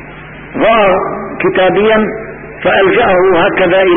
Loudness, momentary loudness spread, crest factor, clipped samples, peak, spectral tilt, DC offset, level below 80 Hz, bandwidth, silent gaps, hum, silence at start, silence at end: -10 LUFS; 15 LU; 10 dB; under 0.1%; 0 dBFS; -11.5 dB/octave; under 0.1%; -38 dBFS; 3.7 kHz; none; none; 0 s; 0 s